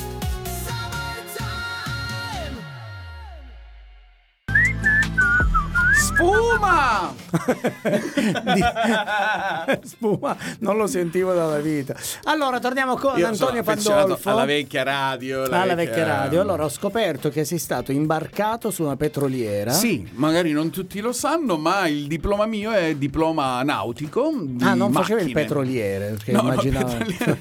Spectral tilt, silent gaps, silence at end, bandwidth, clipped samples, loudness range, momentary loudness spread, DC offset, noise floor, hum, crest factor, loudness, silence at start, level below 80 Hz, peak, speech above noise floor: -4.5 dB/octave; none; 0 s; 19 kHz; under 0.1%; 5 LU; 10 LU; under 0.1%; -53 dBFS; none; 18 dB; -21 LUFS; 0 s; -38 dBFS; -4 dBFS; 31 dB